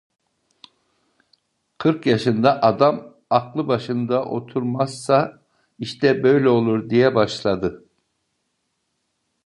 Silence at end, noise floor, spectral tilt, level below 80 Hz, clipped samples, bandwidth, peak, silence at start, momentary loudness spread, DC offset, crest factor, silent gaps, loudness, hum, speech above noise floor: 1.7 s; -73 dBFS; -6.5 dB/octave; -58 dBFS; under 0.1%; 11.5 kHz; -2 dBFS; 1.8 s; 9 LU; under 0.1%; 20 dB; none; -20 LUFS; none; 54 dB